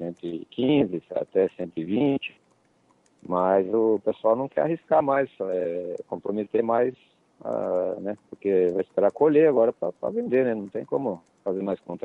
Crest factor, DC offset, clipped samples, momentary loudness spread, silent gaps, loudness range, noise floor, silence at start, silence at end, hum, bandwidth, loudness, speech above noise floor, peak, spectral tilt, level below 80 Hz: 16 dB; under 0.1%; under 0.1%; 11 LU; none; 4 LU; -64 dBFS; 0 s; 0.05 s; none; 4.1 kHz; -25 LUFS; 40 dB; -8 dBFS; -9 dB/octave; -70 dBFS